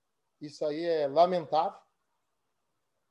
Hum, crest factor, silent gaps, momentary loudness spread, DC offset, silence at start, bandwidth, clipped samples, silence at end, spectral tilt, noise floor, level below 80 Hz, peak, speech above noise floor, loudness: none; 20 dB; none; 16 LU; under 0.1%; 0.4 s; 9.2 kHz; under 0.1%; 1.35 s; -6 dB/octave; -83 dBFS; -82 dBFS; -12 dBFS; 54 dB; -29 LUFS